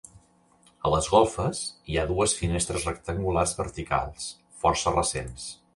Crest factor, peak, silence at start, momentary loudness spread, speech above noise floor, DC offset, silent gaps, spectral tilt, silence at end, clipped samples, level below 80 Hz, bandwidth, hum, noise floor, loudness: 20 dB; -8 dBFS; 0.85 s; 12 LU; 34 dB; under 0.1%; none; -4 dB/octave; 0.2 s; under 0.1%; -42 dBFS; 11.5 kHz; none; -61 dBFS; -26 LUFS